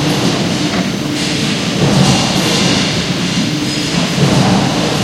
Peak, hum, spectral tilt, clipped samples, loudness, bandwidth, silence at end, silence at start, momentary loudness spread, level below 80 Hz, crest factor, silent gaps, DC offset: 0 dBFS; none; -4.5 dB/octave; under 0.1%; -13 LUFS; 16 kHz; 0 s; 0 s; 5 LU; -38 dBFS; 14 dB; none; under 0.1%